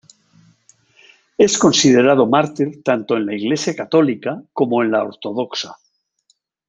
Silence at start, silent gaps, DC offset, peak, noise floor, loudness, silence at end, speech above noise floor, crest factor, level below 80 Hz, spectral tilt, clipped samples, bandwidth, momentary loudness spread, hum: 1.4 s; none; under 0.1%; -2 dBFS; -63 dBFS; -17 LUFS; 0.95 s; 47 dB; 16 dB; -62 dBFS; -4 dB/octave; under 0.1%; 9.4 kHz; 13 LU; none